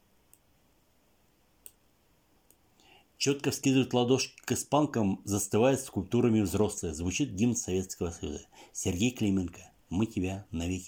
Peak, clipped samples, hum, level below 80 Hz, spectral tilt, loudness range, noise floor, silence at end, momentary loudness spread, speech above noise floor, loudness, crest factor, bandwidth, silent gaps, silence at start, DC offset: -12 dBFS; under 0.1%; none; -58 dBFS; -5 dB/octave; 5 LU; -68 dBFS; 0 s; 9 LU; 39 dB; -30 LUFS; 18 dB; 17 kHz; none; 3.2 s; under 0.1%